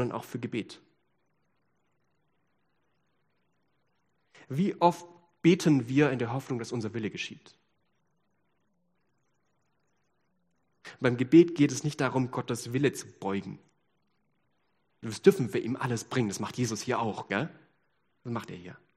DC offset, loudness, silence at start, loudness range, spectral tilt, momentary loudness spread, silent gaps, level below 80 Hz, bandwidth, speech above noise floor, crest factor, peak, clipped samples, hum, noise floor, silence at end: under 0.1%; -29 LUFS; 0 s; 12 LU; -6 dB/octave; 14 LU; none; -72 dBFS; 14 kHz; 48 dB; 24 dB; -8 dBFS; under 0.1%; none; -77 dBFS; 0.2 s